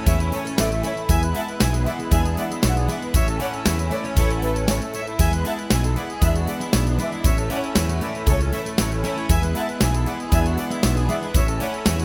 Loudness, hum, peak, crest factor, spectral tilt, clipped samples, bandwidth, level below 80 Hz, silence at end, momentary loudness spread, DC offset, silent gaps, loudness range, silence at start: -22 LUFS; none; -4 dBFS; 16 dB; -5.5 dB/octave; under 0.1%; 18.5 kHz; -24 dBFS; 0 s; 3 LU; under 0.1%; none; 0 LU; 0 s